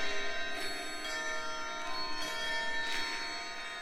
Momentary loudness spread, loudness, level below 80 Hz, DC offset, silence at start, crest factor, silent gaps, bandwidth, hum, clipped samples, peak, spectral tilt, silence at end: 4 LU; -36 LUFS; -54 dBFS; under 0.1%; 0 s; 14 dB; none; 15.5 kHz; none; under 0.1%; -20 dBFS; -1 dB/octave; 0 s